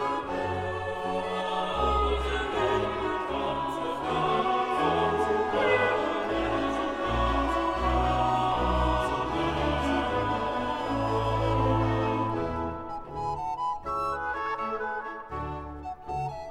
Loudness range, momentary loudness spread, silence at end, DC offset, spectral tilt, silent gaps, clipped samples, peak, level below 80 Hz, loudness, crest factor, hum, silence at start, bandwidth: 5 LU; 8 LU; 0 s; under 0.1%; -6.5 dB/octave; none; under 0.1%; -12 dBFS; -40 dBFS; -28 LUFS; 14 dB; none; 0 s; 13 kHz